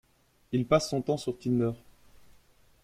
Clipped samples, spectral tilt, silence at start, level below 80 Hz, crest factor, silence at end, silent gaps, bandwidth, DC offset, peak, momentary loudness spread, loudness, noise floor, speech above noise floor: under 0.1%; -6 dB/octave; 0.5 s; -60 dBFS; 22 dB; 1.05 s; none; 15.5 kHz; under 0.1%; -10 dBFS; 7 LU; -29 LUFS; -61 dBFS; 33 dB